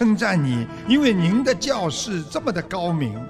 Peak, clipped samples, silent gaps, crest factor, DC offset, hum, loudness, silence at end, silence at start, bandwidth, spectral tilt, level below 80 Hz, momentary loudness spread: -4 dBFS; under 0.1%; none; 16 dB; under 0.1%; none; -21 LUFS; 0 s; 0 s; 13.5 kHz; -5.5 dB/octave; -50 dBFS; 8 LU